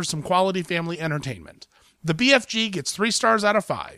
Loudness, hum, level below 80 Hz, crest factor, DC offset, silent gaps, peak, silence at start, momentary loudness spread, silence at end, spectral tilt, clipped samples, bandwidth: -22 LUFS; none; -58 dBFS; 20 dB; under 0.1%; none; -4 dBFS; 0 s; 11 LU; 0 s; -3.5 dB/octave; under 0.1%; 15.5 kHz